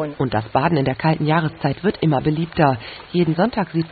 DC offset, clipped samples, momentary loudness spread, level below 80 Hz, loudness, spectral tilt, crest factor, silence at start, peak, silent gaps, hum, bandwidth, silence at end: under 0.1%; under 0.1%; 5 LU; -46 dBFS; -20 LUFS; -12.5 dB/octave; 16 dB; 0 s; -2 dBFS; none; none; 4.8 kHz; 0 s